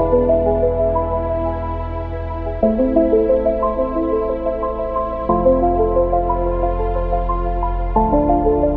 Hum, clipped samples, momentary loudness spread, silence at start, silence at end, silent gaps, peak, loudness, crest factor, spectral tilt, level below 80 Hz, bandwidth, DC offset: none; under 0.1%; 7 LU; 0 s; 0 s; none; -2 dBFS; -18 LUFS; 14 dB; -11.5 dB/octave; -24 dBFS; 4.2 kHz; under 0.1%